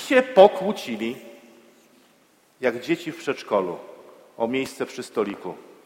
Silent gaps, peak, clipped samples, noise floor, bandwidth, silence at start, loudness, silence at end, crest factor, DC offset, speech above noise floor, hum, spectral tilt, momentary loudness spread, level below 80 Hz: none; 0 dBFS; under 0.1%; -59 dBFS; 16 kHz; 0 s; -23 LUFS; 0.25 s; 24 dB; under 0.1%; 37 dB; none; -5 dB/octave; 20 LU; -70 dBFS